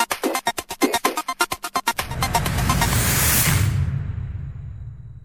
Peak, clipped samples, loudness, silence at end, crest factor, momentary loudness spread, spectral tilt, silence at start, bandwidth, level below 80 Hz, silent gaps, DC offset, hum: -4 dBFS; under 0.1%; -21 LUFS; 0.05 s; 18 dB; 17 LU; -3.5 dB/octave; 0 s; 17.5 kHz; -32 dBFS; none; under 0.1%; none